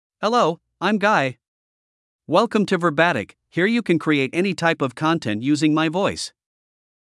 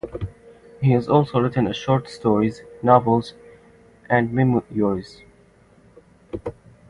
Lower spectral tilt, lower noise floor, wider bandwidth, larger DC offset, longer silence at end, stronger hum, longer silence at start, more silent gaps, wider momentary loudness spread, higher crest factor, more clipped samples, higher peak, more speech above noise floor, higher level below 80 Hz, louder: second, -5.5 dB/octave vs -8 dB/octave; first, under -90 dBFS vs -53 dBFS; first, 12 kHz vs 10.5 kHz; neither; first, 0.9 s vs 0.4 s; neither; first, 0.2 s vs 0.05 s; first, 1.48-2.19 s vs none; second, 6 LU vs 17 LU; about the same, 20 dB vs 22 dB; neither; about the same, -2 dBFS vs 0 dBFS; first, over 70 dB vs 33 dB; second, -66 dBFS vs -48 dBFS; about the same, -20 LUFS vs -20 LUFS